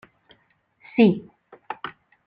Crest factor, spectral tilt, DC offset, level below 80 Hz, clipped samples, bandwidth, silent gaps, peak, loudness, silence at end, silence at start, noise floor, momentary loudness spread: 20 dB; -10 dB/octave; under 0.1%; -66 dBFS; under 0.1%; 5 kHz; none; -6 dBFS; -23 LUFS; 0.35 s; 0.95 s; -64 dBFS; 19 LU